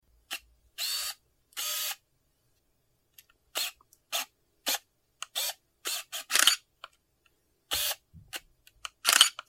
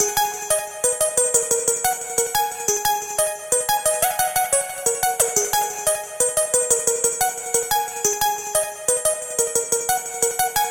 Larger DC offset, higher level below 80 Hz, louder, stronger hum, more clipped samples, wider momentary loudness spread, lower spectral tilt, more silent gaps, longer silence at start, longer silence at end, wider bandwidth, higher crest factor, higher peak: second, under 0.1% vs 0.1%; second, -68 dBFS vs -54 dBFS; second, -29 LUFS vs -20 LUFS; neither; neither; first, 20 LU vs 5 LU; second, 2.5 dB/octave vs 0 dB/octave; neither; first, 0.3 s vs 0 s; about the same, 0.1 s vs 0 s; about the same, 16.5 kHz vs 17 kHz; first, 32 dB vs 20 dB; about the same, -2 dBFS vs -2 dBFS